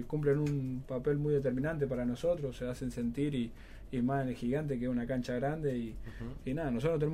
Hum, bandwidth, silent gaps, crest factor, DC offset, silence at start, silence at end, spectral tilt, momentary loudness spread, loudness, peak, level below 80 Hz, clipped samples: none; 14 kHz; none; 14 dB; under 0.1%; 0 s; 0 s; -8 dB/octave; 8 LU; -35 LUFS; -20 dBFS; -50 dBFS; under 0.1%